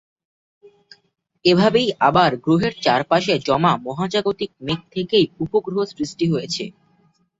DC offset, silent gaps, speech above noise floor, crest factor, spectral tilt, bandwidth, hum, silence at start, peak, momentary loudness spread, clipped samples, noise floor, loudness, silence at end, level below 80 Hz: under 0.1%; none; 42 dB; 18 dB; -5.5 dB/octave; 8 kHz; none; 1.45 s; -2 dBFS; 10 LU; under 0.1%; -61 dBFS; -19 LUFS; 0.7 s; -54 dBFS